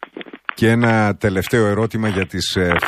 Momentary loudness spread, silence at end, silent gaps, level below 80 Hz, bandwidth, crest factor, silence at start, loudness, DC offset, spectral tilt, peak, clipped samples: 11 LU; 0 s; none; -44 dBFS; 15.5 kHz; 16 dB; 0 s; -17 LUFS; under 0.1%; -5.5 dB/octave; -2 dBFS; under 0.1%